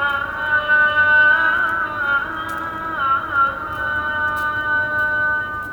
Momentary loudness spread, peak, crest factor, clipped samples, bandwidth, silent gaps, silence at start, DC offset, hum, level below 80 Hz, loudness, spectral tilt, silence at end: 11 LU; -6 dBFS; 14 dB; under 0.1%; 19.5 kHz; none; 0 s; under 0.1%; none; -46 dBFS; -17 LUFS; -4.5 dB/octave; 0 s